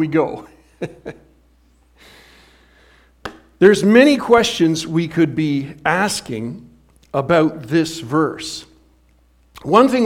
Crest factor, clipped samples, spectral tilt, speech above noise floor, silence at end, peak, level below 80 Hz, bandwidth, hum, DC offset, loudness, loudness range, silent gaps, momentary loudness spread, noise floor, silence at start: 18 dB; under 0.1%; -5.5 dB/octave; 38 dB; 0 s; 0 dBFS; -52 dBFS; 16 kHz; none; under 0.1%; -16 LUFS; 8 LU; none; 23 LU; -54 dBFS; 0 s